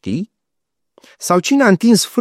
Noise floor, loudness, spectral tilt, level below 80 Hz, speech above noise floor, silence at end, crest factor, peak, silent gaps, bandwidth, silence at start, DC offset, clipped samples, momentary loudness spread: -79 dBFS; -14 LUFS; -4.5 dB/octave; -64 dBFS; 65 dB; 0 s; 14 dB; 0 dBFS; none; 15.5 kHz; 0.05 s; under 0.1%; under 0.1%; 15 LU